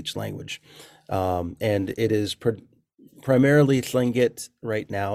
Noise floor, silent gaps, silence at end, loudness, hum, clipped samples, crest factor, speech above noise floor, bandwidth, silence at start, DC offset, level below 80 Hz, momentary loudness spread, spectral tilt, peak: -54 dBFS; none; 0 s; -23 LUFS; none; under 0.1%; 18 dB; 31 dB; 16 kHz; 0 s; under 0.1%; -56 dBFS; 17 LU; -6 dB/octave; -6 dBFS